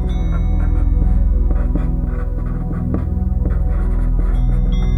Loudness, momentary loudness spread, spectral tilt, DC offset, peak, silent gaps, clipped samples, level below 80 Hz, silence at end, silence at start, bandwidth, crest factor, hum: -20 LUFS; 5 LU; -9.5 dB/octave; under 0.1%; -4 dBFS; none; under 0.1%; -16 dBFS; 0 s; 0 s; 3.8 kHz; 12 dB; none